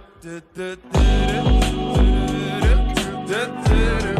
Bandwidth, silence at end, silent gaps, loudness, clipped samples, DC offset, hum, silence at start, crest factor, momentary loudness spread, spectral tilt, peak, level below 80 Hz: 13 kHz; 0 s; none; -20 LUFS; under 0.1%; under 0.1%; none; 0.25 s; 12 dB; 13 LU; -6 dB/octave; -6 dBFS; -20 dBFS